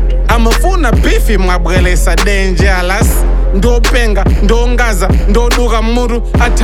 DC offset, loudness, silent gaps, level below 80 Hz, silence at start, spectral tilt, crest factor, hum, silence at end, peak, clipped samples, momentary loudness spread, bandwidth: under 0.1%; -11 LUFS; none; -10 dBFS; 0 s; -5 dB/octave; 8 dB; none; 0 s; 0 dBFS; under 0.1%; 2 LU; 15 kHz